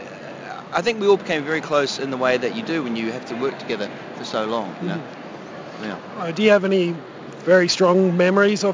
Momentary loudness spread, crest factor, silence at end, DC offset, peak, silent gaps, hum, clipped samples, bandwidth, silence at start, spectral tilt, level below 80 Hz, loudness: 18 LU; 18 dB; 0 s; under 0.1%; -4 dBFS; none; none; under 0.1%; 7.6 kHz; 0 s; -5 dB/octave; -66 dBFS; -20 LUFS